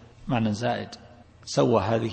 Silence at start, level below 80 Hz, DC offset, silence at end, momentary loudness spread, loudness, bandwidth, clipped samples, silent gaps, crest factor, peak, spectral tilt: 0 s; -52 dBFS; under 0.1%; 0 s; 20 LU; -26 LUFS; 8.8 kHz; under 0.1%; none; 20 dB; -8 dBFS; -6 dB/octave